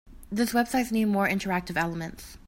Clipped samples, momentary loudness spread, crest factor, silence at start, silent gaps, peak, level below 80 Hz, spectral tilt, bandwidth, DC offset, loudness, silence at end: under 0.1%; 10 LU; 16 dB; 0.05 s; none; -10 dBFS; -50 dBFS; -5 dB/octave; 16.5 kHz; under 0.1%; -27 LUFS; 0.1 s